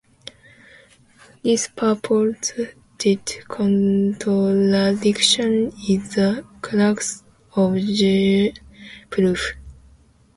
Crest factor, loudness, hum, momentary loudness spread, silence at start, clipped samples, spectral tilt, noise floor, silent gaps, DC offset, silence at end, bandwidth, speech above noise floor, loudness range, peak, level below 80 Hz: 18 dB; -20 LUFS; none; 13 LU; 1.45 s; under 0.1%; -5 dB/octave; -52 dBFS; none; under 0.1%; 0.65 s; 11.5 kHz; 33 dB; 4 LU; -4 dBFS; -50 dBFS